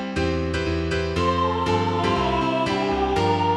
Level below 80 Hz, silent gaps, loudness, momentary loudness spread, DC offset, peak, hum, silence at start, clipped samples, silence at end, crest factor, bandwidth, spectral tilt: -36 dBFS; none; -22 LUFS; 3 LU; under 0.1%; -8 dBFS; none; 0 s; under 0.1%; 0 s; 14 dB; 11.5 kHz; -6 dB/octave